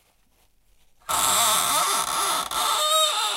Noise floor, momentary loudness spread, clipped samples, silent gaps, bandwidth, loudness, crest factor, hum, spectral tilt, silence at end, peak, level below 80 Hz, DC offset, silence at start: -62 dBFS; 5 LU; under 0.1%; none; 16.5 kHz; -21 LUFS; 18 dB; none; 1 dB/octave; 0 s; -8 dBFS; -58 dBFS; under 0.1%; 1.1 s